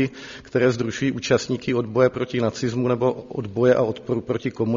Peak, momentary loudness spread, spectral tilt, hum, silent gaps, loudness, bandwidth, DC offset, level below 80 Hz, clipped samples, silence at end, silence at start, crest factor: -4 dBFS; 8 LU; -6 dB/octave; none; none; -22 LUFS; 7.4 kHz; under 0.1%; -54 dBFS; under 0.1%; 0 s; 0 s; 18 dB